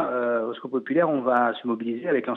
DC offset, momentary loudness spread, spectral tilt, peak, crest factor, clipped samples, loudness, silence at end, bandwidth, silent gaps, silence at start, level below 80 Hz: under 0.1%; 7 LU; -8.5 dB/octave; -8 dBFS; 16 dB; under 0.1%; -25 LUFS; 0 s; 4.2 kHz; none; 0 s; -86 dBFS